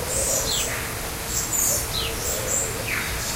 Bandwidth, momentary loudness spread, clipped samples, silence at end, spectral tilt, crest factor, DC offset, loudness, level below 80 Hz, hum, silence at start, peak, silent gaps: 16 kHz; 6 LU; under 0.1%; 0 s; -1.5 dB/octave; 16 dB; under 0.1%; -23 LUFS; -38 dBFS; none; 0 s; -8 dBFS; none